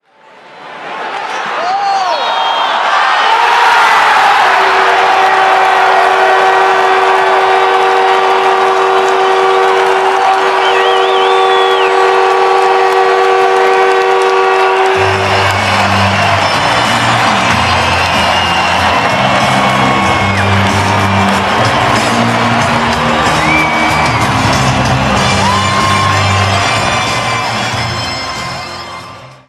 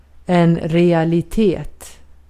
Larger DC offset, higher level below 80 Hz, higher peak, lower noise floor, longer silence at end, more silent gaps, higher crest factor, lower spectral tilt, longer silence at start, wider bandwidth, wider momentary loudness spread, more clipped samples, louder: neither; about the same, -36 dBFS vs -38 dBFS; about the same, 0 dBFS vs -2 dBFS; about the same, -39 dBFS vs -39 dBFS; second, 0.15 s vs 0.35 s; neither; second, 10 dB vs 16 dB; second, -4 dB/octave vs -8 dB/octave; first, 0.5 s vs 0.3 s; first, 14.5 kHz vs 13 kHz; second, 5 LU vs 8 LU; neither; first, -9 LUFS vs -16 LUFS